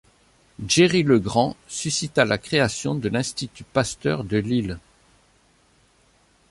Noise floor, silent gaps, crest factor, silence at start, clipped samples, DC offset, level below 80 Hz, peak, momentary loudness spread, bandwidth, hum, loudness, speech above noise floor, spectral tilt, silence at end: -60 dBFS; none; 20 dB; 0.6 s; under 0.1%; under 0.1%; -50 dBFS; -4 dBFS; 12 LU; 11.5 kHz; none; -22 LUFS; 38 dB; -4.5 dB/octave; 1.7 s